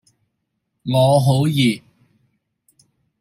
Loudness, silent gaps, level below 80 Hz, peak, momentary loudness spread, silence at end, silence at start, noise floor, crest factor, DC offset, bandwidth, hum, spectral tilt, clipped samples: -17 LUFS; none; -58 dBFS; -4 dBFS; 14 LU; 1.45 s; 0.85 s; -74 dBFS; 18 dB; under 0.1%; 15.5 kHz; none; -6.5 dB/octave; under 0.1%